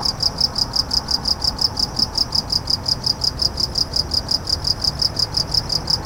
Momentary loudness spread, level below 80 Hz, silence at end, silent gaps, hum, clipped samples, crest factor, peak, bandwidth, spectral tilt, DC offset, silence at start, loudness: 2 LU; -34 dBFS; 0 s; none; none; under 0.1%; 18 dB; -4 dBFS; 17 kHz; -2.5 dB/octave; under 0.1%; 0 s; -18 LUFS